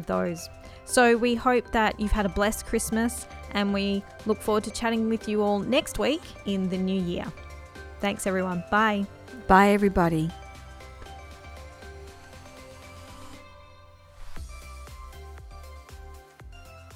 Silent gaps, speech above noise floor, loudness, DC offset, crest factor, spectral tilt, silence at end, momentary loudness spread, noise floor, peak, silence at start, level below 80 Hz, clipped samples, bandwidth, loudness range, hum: none; 26 dB; -25 LUFS; under 0.1%; 22 dB; -5 dB/octave; 0 s; 24 LU; -51 dBFS; -4 dBFS; 0 s; -42 dBFS; under 0.1%; 16 kHz; 21 LU; none